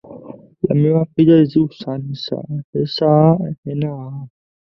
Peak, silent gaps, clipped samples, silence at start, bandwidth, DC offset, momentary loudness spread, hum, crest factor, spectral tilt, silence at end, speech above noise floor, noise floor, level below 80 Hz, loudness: -2 dBFS; 2.64-2.73 s, 3.58-3.63 s; under 0.1%; 0.1 s; 6 kHz; under 0.1%; 17 LU; none; 16 dB; -10 dB/octave; 0.45 s; 21 dB; -37 dBFS; -54 dBFS; -17 LUFS